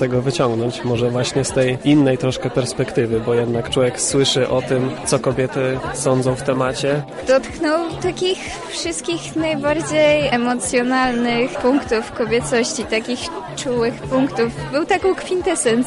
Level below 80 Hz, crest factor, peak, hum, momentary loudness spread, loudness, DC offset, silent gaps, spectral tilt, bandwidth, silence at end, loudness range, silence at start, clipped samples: -44 dBFS; 14 dB; -4 dBFS; none; 6 LU; -19 LUFS; under 0.1%; none; -4.5 dB/octave; 11.5 kHz; 0 s; 3 LU; 0 s; under 0.1%